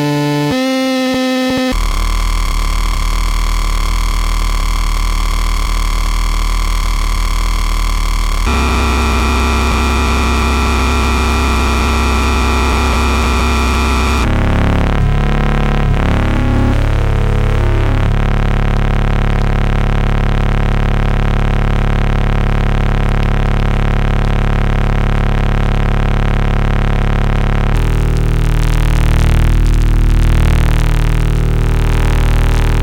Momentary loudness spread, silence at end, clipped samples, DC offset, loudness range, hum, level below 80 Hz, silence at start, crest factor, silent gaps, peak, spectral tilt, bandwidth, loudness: 4 LU; 0 s; under 0.1%; under 0.1%; 4 LU; none; -14 dBFS; 0 s; 10 dB; none; -2 dBFS; -5.5 dB/octave; 16 kHz; -15 LUFS